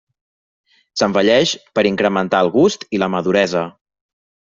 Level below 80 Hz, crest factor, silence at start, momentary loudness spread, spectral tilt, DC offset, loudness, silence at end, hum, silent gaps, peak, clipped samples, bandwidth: -56 dBFS; 18 dB; 0.95 s; 7 LU; -4.5 dB/octave; under 0.1%; -16 LUFS; 0.8 s; none; none; 0 dBFS; under 0.1%; 7.8 kHz